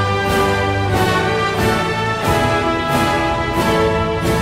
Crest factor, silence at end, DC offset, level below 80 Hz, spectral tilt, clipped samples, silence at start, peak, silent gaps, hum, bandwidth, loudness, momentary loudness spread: 14 dB; 0 s; under 0.1%; -32 dBFS; -5 dB/octave; under 0.1%; 0 s; -2 dBFS; none; none; 16 kHz; -16 LUFS; 2 LU